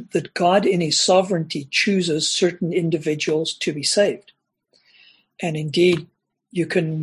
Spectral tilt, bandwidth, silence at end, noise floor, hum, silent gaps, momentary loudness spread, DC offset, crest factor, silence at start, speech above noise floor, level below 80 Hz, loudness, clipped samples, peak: -4 dB/octave; 12 kHz; 0 s; -64 dBFS; none; none; 9 LU; under 0.1%; 18 dB; 0 s; 45 dB; -64 dBFS; -20 LUFS; under 0.1%; -4 dBFS